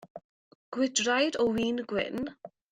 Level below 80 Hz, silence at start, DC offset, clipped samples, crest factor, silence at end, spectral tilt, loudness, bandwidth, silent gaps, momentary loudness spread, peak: -64 dBFS; 0 s; under 0.1%; under 0.1%; 18 dB; 0.25 s; -3 dB/octave; -29 LUFS; 13 kHz; 0.10-0.15 s, 0.24-0.72 s; 12 LU; -12 dBFS